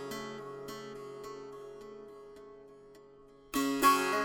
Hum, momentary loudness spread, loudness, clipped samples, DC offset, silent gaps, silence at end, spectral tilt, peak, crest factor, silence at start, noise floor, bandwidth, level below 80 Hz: none; 26 LU; -33 LUFS; under 0.1%; under 0.1%; none; 0 s; -3 dB/octave; -14 dBFS; 22 dB; 0 s; -57 dBFS; 17 kHz; -66 dBFS